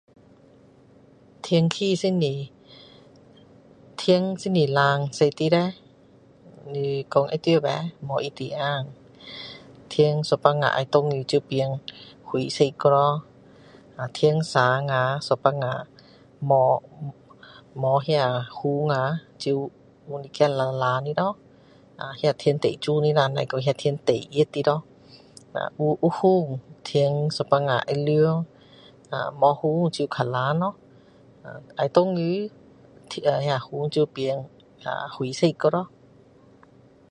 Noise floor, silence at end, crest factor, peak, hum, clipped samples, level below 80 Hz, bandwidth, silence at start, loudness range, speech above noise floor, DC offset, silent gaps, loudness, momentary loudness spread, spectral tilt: -54 dBFS; 1.25 s; 24 dB; 0 dBFS; none; under 0.1%; -66 dBFS; 10.5 kHz; 1.45 s; 4 LU; 31 dB; under 0.1%; none; -24 LUFS; 16 LU; -6.5 dB/octave